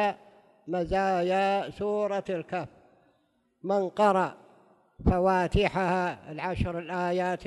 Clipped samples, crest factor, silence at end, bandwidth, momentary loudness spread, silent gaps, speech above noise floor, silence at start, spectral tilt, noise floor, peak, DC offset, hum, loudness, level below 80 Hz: under 0.1%; 18 dB; 0 s; 12 kHz; 11 LU; none; 44 dB; 0 s; -7 dB/octave; -71 dBFS; -10 dBFS; under 0.1%; none; -28 LUFS; -44 dBFS